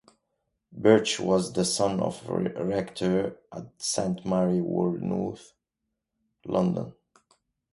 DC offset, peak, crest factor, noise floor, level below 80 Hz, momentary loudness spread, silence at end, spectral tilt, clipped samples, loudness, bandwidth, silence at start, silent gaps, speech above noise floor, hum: under 0.1%; -6 dBFS; 22 dB; -84 dBFS; -60 dBFS; 13 LU; 0.8 s; -5 dB/octave; under 0.1%; -27 LUFS; 11.5 kHz; 0.75 s; none; 57 dB; none